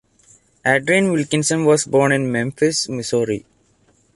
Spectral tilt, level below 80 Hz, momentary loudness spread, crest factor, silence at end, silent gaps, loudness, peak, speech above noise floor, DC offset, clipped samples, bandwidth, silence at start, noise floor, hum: -4.5 dB/octave; -58 dBFS; 6 LU; 16 dB; 0.75 s; none; -18 LUFS; -2 dBFS; 41 dB; under 0.1%; under 0.1%; 11.5 kHz; 0.65 s; -58 dBFS; none